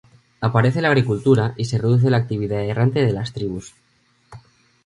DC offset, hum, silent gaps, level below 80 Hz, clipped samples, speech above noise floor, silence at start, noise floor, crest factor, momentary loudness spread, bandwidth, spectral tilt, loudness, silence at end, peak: under 0.1%; none; none; -50 dBFS; under 0.1%; 43 dB; 0.4 s; -61 dBFS; 20 dB; 9 LU; 10.5 kHz; -7.5 dB/octave; -19 LUFS; 0.45 s; 0 dBFS